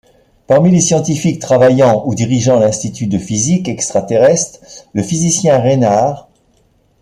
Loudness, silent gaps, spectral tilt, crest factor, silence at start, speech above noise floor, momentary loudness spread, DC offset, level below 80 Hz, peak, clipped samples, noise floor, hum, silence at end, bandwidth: -12 LUFS; none; -5.5 dB/octave; 12 dB; 0.5 s; 42 dB; 8 LU; under 0.1%; -48 dBFS; 0 dBFS; under 0.1%; -54 dBFS; none; 0.8 s; 12.5 kHz